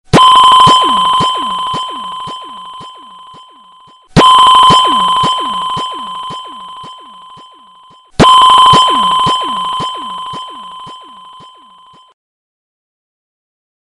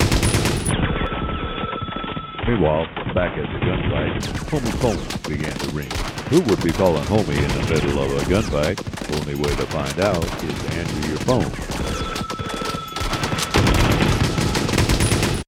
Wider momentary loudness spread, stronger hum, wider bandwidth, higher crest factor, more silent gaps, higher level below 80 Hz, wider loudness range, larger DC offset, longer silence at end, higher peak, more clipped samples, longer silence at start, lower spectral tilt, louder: first, 24 LU vs 8 LU; neither; second, 11.5 kHz vs 18 kHz; second, 12 dB vs 18 dB; neither; second, -38 dBFS vs -30 dBFS; first, 11 LU vs 3 LU; neither; first, 2.95 s vs 0.05 s; about the same, 0 dBFS vs -2 dBFS; neither; first, 0.15 s vs 0 s; second, -3.5 dB/octave vs -5 dB/octave; first, -8 LUFS vs -21 LUFS